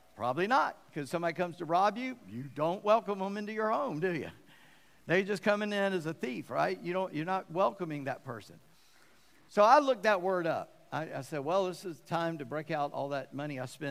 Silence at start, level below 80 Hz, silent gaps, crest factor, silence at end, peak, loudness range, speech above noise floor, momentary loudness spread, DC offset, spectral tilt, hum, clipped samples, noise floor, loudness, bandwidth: 0.15 s; -78 dBFS; none; 24 dB; 0 s; -10 dBFS; 5 LU; 32 dB; 11 LU; under 0.1%; -5.5 dB/octave; none; under 0.1%; -64 dBFS; -32 LUFS; 15.5 kHz